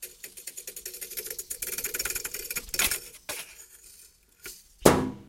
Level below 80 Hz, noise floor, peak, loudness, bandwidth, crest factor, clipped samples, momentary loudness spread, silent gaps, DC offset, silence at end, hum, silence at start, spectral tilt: -50 dBFS; -56 dBFS; 0 dBFS; -29 LUFS; 17 kHz; 32 dB; under 0.1%; 21 LU; none; under 0.1%; 0 s; none; 0 s; -3 dB/octave